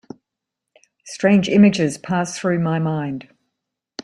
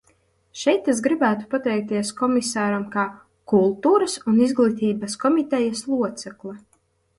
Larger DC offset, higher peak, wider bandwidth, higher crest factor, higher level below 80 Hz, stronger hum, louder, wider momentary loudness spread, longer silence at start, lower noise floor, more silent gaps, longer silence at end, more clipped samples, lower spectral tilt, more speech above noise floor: neither; first, -2 dBFS vs -6 dBFS; about the same, 11.5 kHz vs 11.5 kHz; about the same, 18 dB vs 16 dB; about the same, -60 dBFS vs -64 dBFS; neither; first, -18 LUFS vs -21 LUFS; first, 17 LU vs 9 LU; first, 1.05 s vs 0.55 s; first, -83 dBFS vs -63 dBFS; neither; second, 0 s vs 0.6 s; neither; about the same, -6 dB/octave vs -5 dB/octave; first, 65 dB vs 42 dB